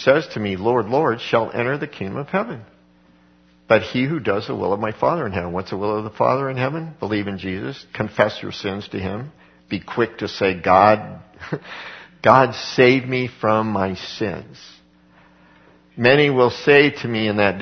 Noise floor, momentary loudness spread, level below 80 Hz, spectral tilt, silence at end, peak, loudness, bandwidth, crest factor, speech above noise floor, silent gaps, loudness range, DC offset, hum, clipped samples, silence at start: -54 dBFS; 16 LU; -56 dBFS; -6.5 dB/octave; 0 s; 0 dBFS; -19 LUFS; 6.6 kHz; 20 dB; 34 dB; none; 6 LU; under 0.1%; none; under 0.1%; 0 s